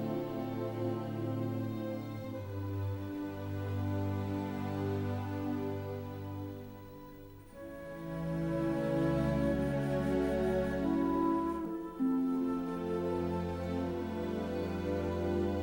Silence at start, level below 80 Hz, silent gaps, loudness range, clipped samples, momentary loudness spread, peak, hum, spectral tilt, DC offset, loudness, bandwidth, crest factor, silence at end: 0 s; -52 dBFS; none; 7 LU; under 0.1%; 11 LU; -20 dBFS; none; -8.5 dB/octave; under 0.1%; -35 LUFS; 16.5 kHz; 14 dB; 0 s